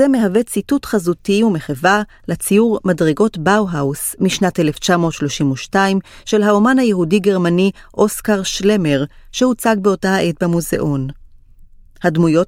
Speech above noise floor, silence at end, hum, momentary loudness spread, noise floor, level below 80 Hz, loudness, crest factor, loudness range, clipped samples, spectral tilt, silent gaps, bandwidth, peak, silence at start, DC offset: 27 dB; 0 s; none; 5 LU; -42 dBFS; -44 dBFS; -16 LUFS; 14 dB; 2 LU; under 0.1%; -5.5 dB/octave; none; 16.5 kHz; 0 dBFS; 0 s; under 0.1%